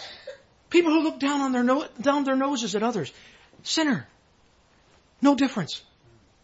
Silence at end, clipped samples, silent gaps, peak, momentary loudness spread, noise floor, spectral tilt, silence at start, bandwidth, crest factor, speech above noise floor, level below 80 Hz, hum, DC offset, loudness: 0.65 s; under 0.1%; none; -8 dBFS; 16 LU; -61 dBFS; -4 dB/octave; 0 s; 8 kHz; 18 dB; 37 dB; -66 dBFS; none; under 0.1%; -24 LUFS